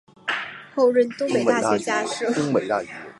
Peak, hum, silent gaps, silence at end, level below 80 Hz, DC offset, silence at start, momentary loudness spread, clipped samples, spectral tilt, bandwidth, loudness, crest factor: -4 dBFS; none; none; 0.05 s; -68 dBFS; under 0.1%; 0.25 s; 8 LU; under 0.1%; -4.5 dB/octave; 11.5 kHz; -22 LUFS; 18 dB